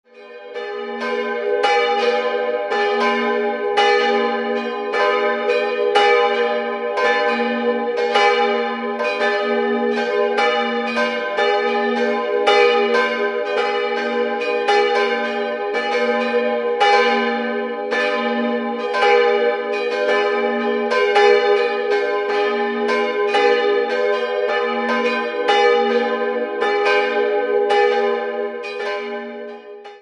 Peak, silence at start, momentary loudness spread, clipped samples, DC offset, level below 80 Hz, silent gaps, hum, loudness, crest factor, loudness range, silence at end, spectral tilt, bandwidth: -2 dBFS; 0.15 s; 8 LU; under 0.1%; under 0.1%; -72 dBFS; none; none; -18 LUFS; 16 dB; 2 LU; 0.05 s; -3 dB/octave; 10.5 kHz